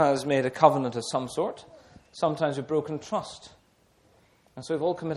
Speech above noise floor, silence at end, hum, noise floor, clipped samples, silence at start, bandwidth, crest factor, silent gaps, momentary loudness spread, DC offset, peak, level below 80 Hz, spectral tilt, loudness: 37 dB; 0 s; none; -63 dBFS; under 0.1%; 0 s; 13 kHz; 24 dB; none; 21 LU; under 0.1%; -4 dBFS; -66 dBFS; -5.5 dB/octave; -27 LUFS